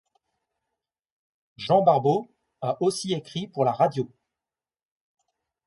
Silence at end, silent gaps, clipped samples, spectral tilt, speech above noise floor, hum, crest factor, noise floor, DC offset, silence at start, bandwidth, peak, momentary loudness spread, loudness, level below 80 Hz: 1.6 s; none; under 0.1%; -6 dB/octave; over 67 dB; none; 22 dB; under -90 dBFS; under 0.1%; 1.6 s; 11.5 kHz; -6 dBFS; 14 LU; -24 LUFS; -70 dBFS